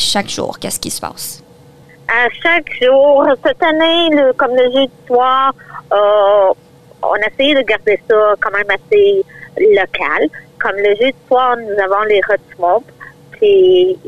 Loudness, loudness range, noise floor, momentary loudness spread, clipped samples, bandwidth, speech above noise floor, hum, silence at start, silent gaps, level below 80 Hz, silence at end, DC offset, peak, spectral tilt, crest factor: -12 LUFS; 3 LU; -41 dBFS; 10 LU; under 0.1%; 14 kHz; 29 dB; none; 0 s; none; -50 dBFS; 0 s; 1%; -2 dBFS; -3 dB/octave; 10 dB